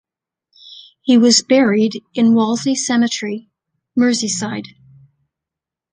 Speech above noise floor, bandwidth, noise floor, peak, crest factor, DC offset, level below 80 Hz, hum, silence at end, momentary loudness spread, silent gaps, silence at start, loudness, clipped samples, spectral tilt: 71 dB; 10 kHz; -86 dBFS; -2 dBFS; 16 dB; under 0.1%; -64 dBFS; none; 1.3 s; 14 LU; none; 0.7 s; -15 LUFS; under 0.1%; -3.5 dB/octave